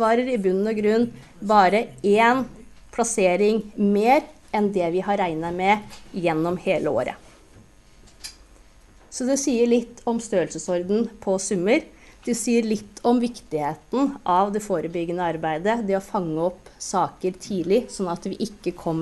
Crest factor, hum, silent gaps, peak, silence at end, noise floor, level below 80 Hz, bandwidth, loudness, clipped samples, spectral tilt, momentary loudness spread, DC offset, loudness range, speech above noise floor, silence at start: 20 dB; none; none; -4 dBFS; 0 s; -51 dBFS; -54 dBFS; 12 kHz; -23 LUFS; under 0.1%; -5 dB/octave; 10 LU; under 0.1%; 5 LU; 28 dB; 0 s